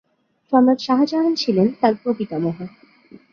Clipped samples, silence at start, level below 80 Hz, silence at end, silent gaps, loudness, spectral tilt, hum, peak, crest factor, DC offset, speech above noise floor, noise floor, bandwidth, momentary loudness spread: under 0.1%; 0.5 s; -64 dBFS; 0.15 s; none; -19 LUFS; -7 dB/octave; none; -2 dBFS; 18 dB; under 0.1%; 29 dB; -47 dBFS; 6.8 kHz; 9 LU